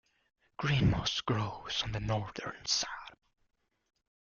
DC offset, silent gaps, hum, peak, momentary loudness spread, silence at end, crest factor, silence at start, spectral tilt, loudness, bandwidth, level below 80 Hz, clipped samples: under 0.1%; none; none; -16 dBFS; 13 LU; 1.3 s; 18 dB; 0.6 s; -4 dB/octave; -33 LUFS; 7.2 kHz; -52 dBFS; under 0.1%